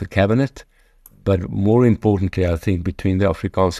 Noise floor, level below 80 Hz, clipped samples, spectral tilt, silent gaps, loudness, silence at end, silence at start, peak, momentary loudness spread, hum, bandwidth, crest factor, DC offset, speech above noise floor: -50 dBFS; -38 dBFS; under 0.1%; -8 dB/octave; none; -19 LUFS; 0 s; 0 s; -2 dBFS; 7 LU; none; 13.5 kHz; 16 dB; under 0.1%; 33 dB